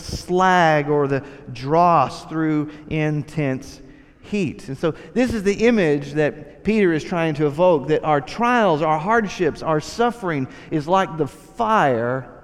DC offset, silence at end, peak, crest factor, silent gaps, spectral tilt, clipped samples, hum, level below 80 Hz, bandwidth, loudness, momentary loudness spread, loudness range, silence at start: under 0.1%; 0.05 s; -4 dBFS; 16 dB; none; -6.5 dB/octave; under 0.1%; none; -46 dBFS; 13.5 kHz; -20 LUFS; 10 LU; 3 LU; 0 s